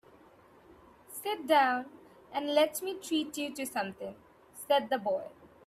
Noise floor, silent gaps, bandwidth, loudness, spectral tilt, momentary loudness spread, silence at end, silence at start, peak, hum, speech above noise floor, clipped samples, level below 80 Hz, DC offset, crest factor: -59 dBFS; none; 16 kHz; -31 LUFS; -2.5 dB/octave; 19 LU; 0.2 s; 0.7 s; -14 dBFS; none; 28 dB; under 0.1%; -74 dBFS; under 0.1%; 20 dB